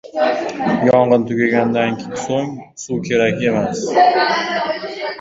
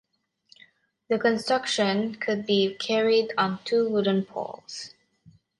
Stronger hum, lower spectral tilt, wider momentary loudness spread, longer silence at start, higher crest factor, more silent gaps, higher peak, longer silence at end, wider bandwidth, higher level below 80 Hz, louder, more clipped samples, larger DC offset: neither; about the same, -5 dB/octave vs -4.5 dB/octave; about the same, 11 LU vs 13 LU; second, 0.05 s vs 1.1 s; about the same, 16 dB vs 16 dB; neither; first, -2 dBFS vs -10 dBFS; second, 0 s vs 0.7 s; second, 8 kHz vs 11.5 kHz; first, -54 dBFS vs -72 dBFS; first, -17 LUFS vs -25 LUFS; neither; neither